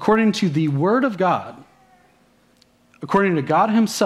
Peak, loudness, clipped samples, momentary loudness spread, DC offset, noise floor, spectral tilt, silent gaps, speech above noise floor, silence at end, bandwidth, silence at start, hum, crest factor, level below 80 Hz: -2 dBFS; -19 LUFS; under 0.1%; 7 LU; under 0.1%; -57 dBFS; -6 dB/octave; none; 39 dB; 0 s; 14 kHz; 0 s; none; 18 dB; -60 dBFS